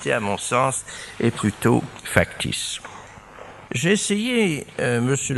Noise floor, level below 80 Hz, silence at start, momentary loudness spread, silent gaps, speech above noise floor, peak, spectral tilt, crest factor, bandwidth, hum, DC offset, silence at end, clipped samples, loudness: -42 dBFS; -50 dBFS; 0 s; 19 LU; none; 20 dB; 0 dBFS; -4.5 dB/octave; 22 dB; 12 kHz; none; under 0.1%; 0 s; under 0.1%; -22 LUFS